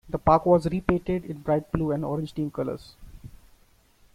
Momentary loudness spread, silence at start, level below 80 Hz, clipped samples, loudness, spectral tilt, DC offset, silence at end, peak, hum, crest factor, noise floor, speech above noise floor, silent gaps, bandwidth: 11 LU; 0.05 s; -44 dBFS; under 0.1%; -25 LUFS; -8.5 dB/octave; under 0.1%; 0.9 s; -4 dBFS; none; 24 dB; -59 dBFS; 35 dB; none; 15 kHz